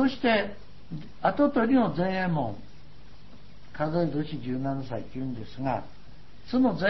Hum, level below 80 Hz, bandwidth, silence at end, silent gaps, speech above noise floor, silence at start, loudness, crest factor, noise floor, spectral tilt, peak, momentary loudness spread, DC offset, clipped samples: none; -54 dBFS; 6 kHz; 0 s; none; 24 dB; 0 s; -28 LUFS; 18 dB; -51 dBFS; -8.5 dB/octave; -10 dBFS; 17 LU; 1%; under 0.1%